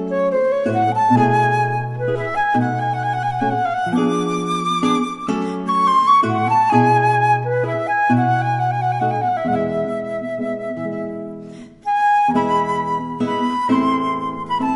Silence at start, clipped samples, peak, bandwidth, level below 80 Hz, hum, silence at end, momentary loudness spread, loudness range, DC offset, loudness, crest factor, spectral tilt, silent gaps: 0 s; under 0.1%; 0 dBFS; 11.5 kHz; -56 dBFS; none; 0 s; 10 LU; 5 LU; under 0.1%; -18 LUFS; 18 dB; -6.5 dB/octave; none